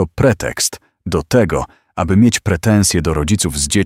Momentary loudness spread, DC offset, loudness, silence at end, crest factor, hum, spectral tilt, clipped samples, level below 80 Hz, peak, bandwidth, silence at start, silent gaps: 9 LU; under 0.1%; -15 LUFS; 0 s; 14 dB; none; -4.5 dB/octave; under 0.1%; -32 dBFS; 0 dBFS; 16.5 kHz; 0 s; none